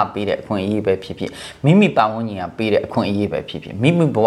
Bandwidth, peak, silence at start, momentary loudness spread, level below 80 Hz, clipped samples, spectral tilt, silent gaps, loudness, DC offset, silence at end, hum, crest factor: 12 kHz; 0 dBFS; 0 s; 13 LU; -52 dBFS; under 0.1%; -7.5 dB/octave; none; -19 LUFS; under 0.1%; 0 s; none; 18 dB